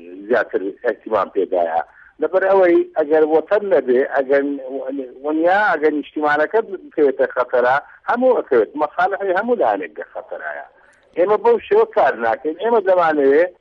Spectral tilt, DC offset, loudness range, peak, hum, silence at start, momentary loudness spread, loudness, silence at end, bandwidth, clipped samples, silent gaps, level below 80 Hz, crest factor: -7 dB/octave; under 0.1%; 2 LU; -6 dBFS; none; 0 s; 12 LU; -17 LUFS; 0.1 s; 6 kHz; under 0.1%; none; -62 dBFS; 12 dB